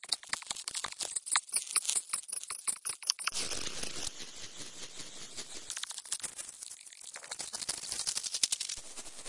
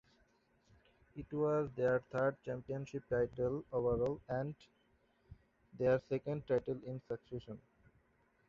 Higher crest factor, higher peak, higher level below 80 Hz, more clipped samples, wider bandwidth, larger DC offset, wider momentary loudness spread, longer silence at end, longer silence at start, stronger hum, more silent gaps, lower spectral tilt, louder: first, 30 dB vs 18 dB; first, -8 dBFS vs -22 dBFS; about the same, -66 dBFS vs -64 dBFS; neither; first, 11.5 kHz vs 7.2 kHz; neither; about the same, 14 LU vs 13 LU; second, 0 s vs 0.9 s; second, 0 s vs 1.15 s; neither; neither; second, 1.5 dB/octave vs -7.5 dB/octave; first, -35 LUFS vs -38 LUFS